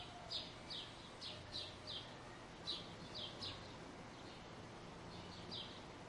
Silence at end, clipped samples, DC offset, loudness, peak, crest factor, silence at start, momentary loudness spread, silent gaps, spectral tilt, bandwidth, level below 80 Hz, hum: 0 s; under 0.1%; under 0.1%; -50 LUFS; -32 dBFS; 20 dB; 0 s; 8 LU; none; -3.5 dB/octave; 11.5 kHz; -68 dBFS; none